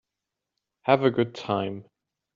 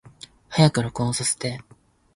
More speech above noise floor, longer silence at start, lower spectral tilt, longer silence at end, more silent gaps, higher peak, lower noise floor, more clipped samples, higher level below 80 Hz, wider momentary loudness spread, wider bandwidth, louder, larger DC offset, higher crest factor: first, 61 dB vs 26 dB; first, 0.85 s vs 0.5 s; about the same, -5 dB/octave vs -4.5 dB/octave; about the same, 0.55 s vs 0.55 s; neither; about the same, -4 dBFS vs -4 dBFS; first, -86 dBFS vs -47 dBFS; neither; second, -70 dBFS vs -52 dBFS; about the same, 12 LU vs 11 LU; second, 7.4 kHz vs 11.5 kHz; second, -25 LUFS vs -22 LUFS; neither; about the same, 24 dB vs 20 dB